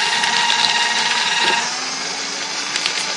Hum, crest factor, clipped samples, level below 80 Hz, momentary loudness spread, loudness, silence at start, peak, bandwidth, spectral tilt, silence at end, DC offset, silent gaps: none; 20 dB; under 0.1%; -68 dBFS; 8 LU; -17 LUFS; 0 s; 0 dBFS; 11.5 kHz; 0.5 dB/octave; 0 s; under 0.1%; none